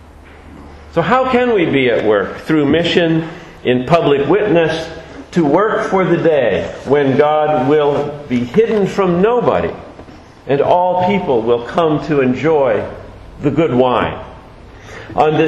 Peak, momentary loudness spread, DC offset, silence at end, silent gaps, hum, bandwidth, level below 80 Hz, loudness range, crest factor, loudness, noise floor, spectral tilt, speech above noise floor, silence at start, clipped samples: 0 dBFS; 10 LU; under 0.1%; 0 s; none; none; 11 kHz; -42 dBFS; 2 LU; 14 dB; -14 LUFS; -38 dBFS; -7 dB/octave; 25 dB; 0.45 s; under 0.1%